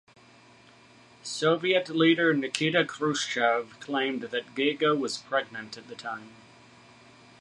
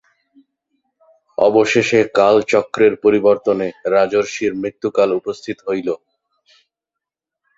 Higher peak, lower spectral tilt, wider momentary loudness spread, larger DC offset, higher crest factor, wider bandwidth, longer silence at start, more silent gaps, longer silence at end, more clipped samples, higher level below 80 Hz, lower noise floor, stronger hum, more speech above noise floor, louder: second, -8 dBFS vs 0 dBFS; about the same, -4 dB/octave vs -5 dB/octave; first, 15 LU vs 10 LU; neither; about the same, 22 dB vs 18 dB; first, 11.5 kHz vs 7.8 kHz; second, 1.25 s vs 1.4 s; neither; second, 1.1 s vs 1.6 s; neither; second, -76 dBFS vs -58 dBFS; second, -55 dBFS vs -84 dBFS; neither; second, 28 dB vs 69 dB; second, -27 LUFS vs -16 LUFS